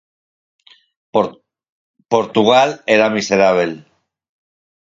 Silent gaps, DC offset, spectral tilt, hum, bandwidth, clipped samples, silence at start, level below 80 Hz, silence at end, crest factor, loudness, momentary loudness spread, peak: 1.69-1.94 s; under 0.1%; -4.5 dB/octave; none; 7.8 kHz; under 0.1%; 1.15 s; -60 dBFS; 1.05 s; 18 dB; -15 LUFS; 10 LU; 0 dBFS